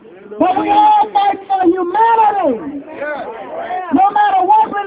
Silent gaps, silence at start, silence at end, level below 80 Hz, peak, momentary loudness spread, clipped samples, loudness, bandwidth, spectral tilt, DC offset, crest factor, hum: none; 0.1 s; 0 s; -54 dBFS; 0 dBFS; 14 LU; under 0.1%; -13 LUFS; 4 kHz; -8 dB/octave; under 0.1%; 12 dB; none